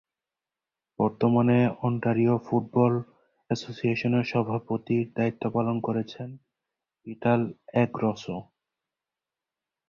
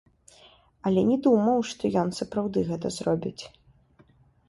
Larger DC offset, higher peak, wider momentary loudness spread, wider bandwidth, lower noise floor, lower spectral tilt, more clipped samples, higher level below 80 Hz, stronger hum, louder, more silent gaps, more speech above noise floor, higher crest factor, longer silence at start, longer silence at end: neither; about the same, -8 dBFS vs -10 dBFS; about the same, 12 LU vs 12 LU; second, 7.2 kHz vs 11.5 kHz; first, -90 dBFS vs -59 dBFS; first, -8 dB/octave vs -6.5 dB/octave; neither; second, -64 dBFS vs -58 dBFS; neither; about the same, -26 LUFS vs -26 LUFS; neither; first, 64 dB vs 34 dB; about the same, 18 dB vs 18 dB; first, 1 s vs 0.85 s; first, 1.45 s vs 1 s